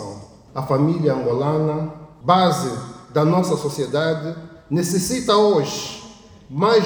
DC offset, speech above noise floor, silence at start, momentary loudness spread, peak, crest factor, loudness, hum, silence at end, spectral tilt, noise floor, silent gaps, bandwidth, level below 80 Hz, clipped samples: under 0.1%; 24 dB; 0 s; 16 LU; -2 dBFS; 18 dB; -20 LUFS; none; 0 s; -5.5 dB/octave; -42 dBFS; none; over 20 kHz; -54 dBFS; under 0.1%